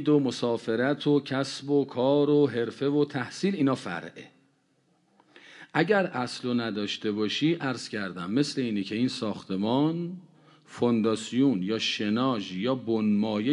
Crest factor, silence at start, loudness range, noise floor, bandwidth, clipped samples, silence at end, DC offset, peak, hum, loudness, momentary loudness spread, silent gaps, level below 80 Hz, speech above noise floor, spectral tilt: 20 dB; 0 s; 4 LU; -68 dBFS; 11 kHz; under 0.1%; 0 s; under 0.1%; -8 dBFS; none; -27 LUFS; 8 LU; none; -70 dBFS; 42 dB; -6 dB/octave